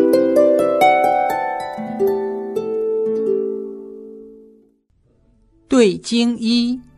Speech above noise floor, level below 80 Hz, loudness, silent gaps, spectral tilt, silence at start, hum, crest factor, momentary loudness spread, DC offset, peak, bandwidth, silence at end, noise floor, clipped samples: 43 dB; -56 dBFS; -17 LUFS; none; -4.5 dB/octave; 0 s; none; 16 dB; 14 LU; under 0.1%; -2 dBFS; 13.5 kHz; 0.15 s; -59 dBFS; under 0.1%